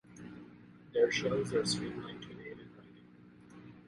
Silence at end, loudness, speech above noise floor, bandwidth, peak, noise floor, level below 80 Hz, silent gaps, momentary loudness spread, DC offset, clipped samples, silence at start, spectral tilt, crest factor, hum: 0.1 s; -34 LUFS; 25 dB; 11.5 kHz; -16 dBFS; -58 dBFS; -66 dBFS; none; 25 LU; under 0.1%; under 0.1%; 0.1 s; -4 dB/octave; 20 dB; 60 Hz at -60 dBFS